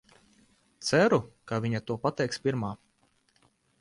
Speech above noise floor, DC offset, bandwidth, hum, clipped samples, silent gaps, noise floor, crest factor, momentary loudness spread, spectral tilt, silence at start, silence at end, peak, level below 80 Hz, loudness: 41 dB; under 0.1%; 11.5 kHz; none; under 0.1%; none; -69 dBFS; 20 dB; 12 LU; -5.5 dB/octave; 0.8 s; 1.05 s; -10 dBFS; -64 dBFS; -29 LUFS